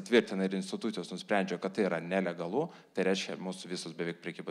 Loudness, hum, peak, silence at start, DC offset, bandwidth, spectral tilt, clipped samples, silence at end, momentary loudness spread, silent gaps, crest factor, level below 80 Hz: -34 LUFS; none; -12 dBFS; 0 s; under 0.1%; 12 kHz; -5 dB/octave; under 0.1%; 0 s; 8 LU; none; 20 dB; -84 dBFS